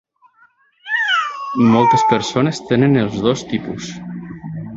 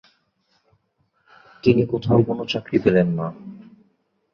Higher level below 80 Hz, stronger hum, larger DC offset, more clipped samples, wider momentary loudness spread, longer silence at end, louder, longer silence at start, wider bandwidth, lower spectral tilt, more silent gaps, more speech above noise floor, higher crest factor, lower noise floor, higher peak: about the same, -52 dBFS vs -52 dBFS; neither; neither; neither; first, 17 LU vs 13 LU; second, 0 s vs 0.75 s; first, -16 LUFS vs -20 LUFS; second, 0.85 s vs 1.65 s; first, 7.8 kHz vs 6.8 kHz; second, -5.5 dB/octave vs -8.5 dB/octave; neither; second, 39 dB vs 49 dB; about the same, 16 dB vs 20 dB; second, -54 dBFS vs -68 dBFS; about the same, -2 dBFS vs -2 dBFS